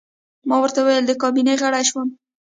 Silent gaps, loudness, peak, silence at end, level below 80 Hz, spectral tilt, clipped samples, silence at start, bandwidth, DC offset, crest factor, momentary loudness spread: none; -18 LUFS; -4 dBFS; 0.4 s; -72 dBFS; -1.5 dB/octave; under 0.1%; 0.45 s; 9.6 kHz; under 0.1%; 14 dB; 10 LU